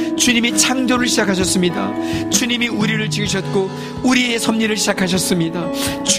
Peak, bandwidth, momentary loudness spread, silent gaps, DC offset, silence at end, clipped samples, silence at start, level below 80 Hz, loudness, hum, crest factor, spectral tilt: 0 dBFS; 15.5 kHz; 7 LU; none; under 0.1%; 0 s; under 0.1%; 0 s; -44 dBFS; -16 LUFS; none; 16 dB; -3 dB/octave